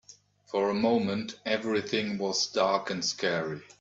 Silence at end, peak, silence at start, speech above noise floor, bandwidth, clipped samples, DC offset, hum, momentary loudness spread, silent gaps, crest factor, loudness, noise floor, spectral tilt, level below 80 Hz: 0.15 s; -10 dBFS; 0.1 s; 28 dB; 7.8 kHz; under 0.1%; under 0.1%; none; 6 LU; none; 18 dB; -29 LUFS; -57 dBFS; -3.5 dB/octave; -70 dBFS